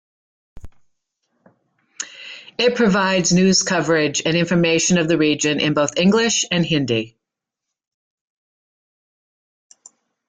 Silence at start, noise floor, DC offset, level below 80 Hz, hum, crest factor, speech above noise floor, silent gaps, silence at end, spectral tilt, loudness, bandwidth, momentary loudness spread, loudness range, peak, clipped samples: 0.55 s; -84 dBFS; under 0.1%; -54 dBFS; none; 16 dB; 67 dB; none; 3.2 s; -4 dB/octave; -17 LUFS; 9.6 kHz; 15 LU; 8 LU; -4 dBFS; under 0.1%